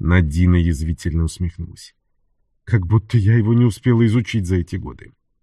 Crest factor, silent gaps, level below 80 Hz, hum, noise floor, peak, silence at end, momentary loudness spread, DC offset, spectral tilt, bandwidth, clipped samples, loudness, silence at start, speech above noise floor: 16 dB; none; -30 dBFS; none; -64 dBFS; -2 dBFS; 0.45 s; 12 LU; under 0.1%; -7.5 dB/octave; 12 kHz; under 0.1%; -18 LUFS; 0 s; 47 dB